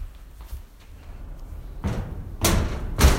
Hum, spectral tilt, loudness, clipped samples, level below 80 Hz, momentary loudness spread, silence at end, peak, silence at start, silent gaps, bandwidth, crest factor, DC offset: none; -4.5 dB/octave; -26 LUFS; under 0.1%; -28 dBFS; 23 LU; 0 s; -4 dBFS; 0 s; none; 16.5 kHz; 22 dB; under 0.1%